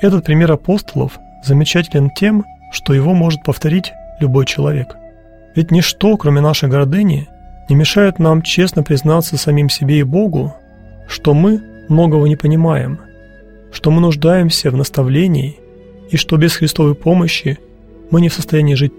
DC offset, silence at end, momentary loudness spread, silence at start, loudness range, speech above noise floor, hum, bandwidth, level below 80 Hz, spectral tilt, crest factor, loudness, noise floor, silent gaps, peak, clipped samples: 0.5%; 0.1 s; 9 LU; 0 s; 2 LU; 28 dB; none; 16.5 kHz; -38 dBFS; -6.5 dB/octave; 12 dB; -13 LUFS; -40 dBFS; none; 0 dBFS; under 0.1%